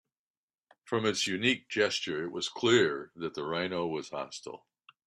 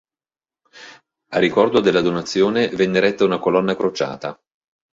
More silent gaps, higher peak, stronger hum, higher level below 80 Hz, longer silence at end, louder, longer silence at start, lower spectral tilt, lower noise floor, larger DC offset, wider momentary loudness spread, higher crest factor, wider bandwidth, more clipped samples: neither; second, -10 dBFS vs -2 dBFS; neither; second, -74 dBFS vs -58 dBFS; about the same, 0.5 s vs 0.6 s; second, -31 LUFS vs -18 LUFS; about the same, 0.85 s vs 0.75 s; second, -3.5 dB/octave vs -5.5 dB/octave; about the same, under -90 dBFS vs under -90 dBFS; neither; first, 13 LU vs 9 LU; about the same, 22 dB vs 18 dB; first, 13 kHz vs 7.8 kHz; neither